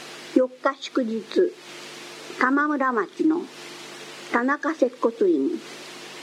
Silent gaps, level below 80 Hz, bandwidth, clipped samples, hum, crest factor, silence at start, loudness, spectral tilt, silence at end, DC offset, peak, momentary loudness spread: none; -88 dBFS; 13.5 kHz; under 0.1%; none; 20 dB; 0 s; -24 LUFS; -4 dB/octave; 0 s; under 0.1%; -4 dBFS; 16 LU